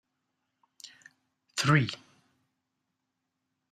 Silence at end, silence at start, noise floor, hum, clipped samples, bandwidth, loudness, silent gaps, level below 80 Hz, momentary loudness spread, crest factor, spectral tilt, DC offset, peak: 1.75 s; 0.85 s; -83 dBFS; none; under 0.1%; 14 kHz; -28 LUFS; none; -70 dBFS; 25 LU; 24 dB; -5 dB/octave; under 0.1%; -12 dBFS